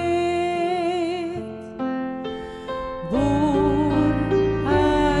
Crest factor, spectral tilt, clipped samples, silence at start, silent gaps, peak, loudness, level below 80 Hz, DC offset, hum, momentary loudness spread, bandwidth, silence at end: 14 dB; -7 dB/octave; under 0.1%; 0 s; none; -8 dBFS; -22 LUFS; -38 dBFS; under 0.1%; none; 11 LU; 11 kHz; 0 s